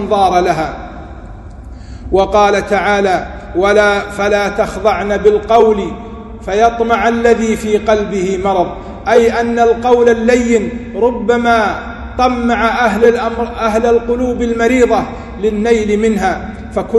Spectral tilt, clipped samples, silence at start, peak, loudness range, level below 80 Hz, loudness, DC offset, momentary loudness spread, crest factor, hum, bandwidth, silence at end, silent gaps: -5.5 dB/octave; 0.2%; 0 s; 0 dBFS; 2 LU; -32 dBFS; -13 LUFS; under 0.1%; 13 LU; 12 dB; none; 12 kHz; 0 s; none